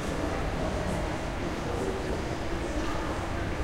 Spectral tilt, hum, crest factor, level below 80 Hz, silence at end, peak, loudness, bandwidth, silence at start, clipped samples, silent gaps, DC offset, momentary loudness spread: -5.5 dB/octave; none; 14 dB; -38 dBFS; 0 s; -16 dBFS; -32 LUFS; 16.5 kHz; 0 s; under 0.1%; none; under 0.1%; 2 LU